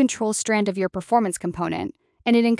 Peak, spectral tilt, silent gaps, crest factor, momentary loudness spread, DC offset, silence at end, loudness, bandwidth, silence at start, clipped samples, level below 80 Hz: -6 dBFS; -4.5 dB/octave; none; 16 dB; 8 LU; under 0.1%; 0 s; -23 LUFS; 12 kHz; 0 s; under 0.1%; -58 dBFS